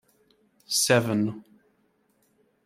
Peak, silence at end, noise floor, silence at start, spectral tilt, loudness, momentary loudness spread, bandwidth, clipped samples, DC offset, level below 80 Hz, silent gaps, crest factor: -6 dBFS; 1.25 s; -68 dBFS; 0.7 s; -3.5 dB/octave; -24 LUFS; 12 LU; 16 kHz; under 0.1%; under 0.1%; -70 dBFS; none; 24 dB